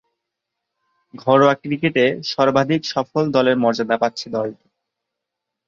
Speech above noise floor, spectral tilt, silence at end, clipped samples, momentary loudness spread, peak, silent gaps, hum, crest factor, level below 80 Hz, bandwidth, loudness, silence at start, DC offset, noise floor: 64 dB; -6 dB/octave; 1.15 s; under 0.1%; 10 LU; -2 dBFS; none; none; 18 dB; -62 dBFS; 7.6 kHz; -18 LUFS; 1.15 s; under 0.1%; -82 dBFS